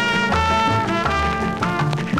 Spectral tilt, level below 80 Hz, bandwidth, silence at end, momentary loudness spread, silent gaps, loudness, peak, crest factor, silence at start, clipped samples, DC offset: -5.5 dB/octave; -34 dBFS; 15 kHz; 0 s; 4 LU; none; -19 LUFS; -4 dBFS; 16 dB; 0 s; under 0.1%; 0.4%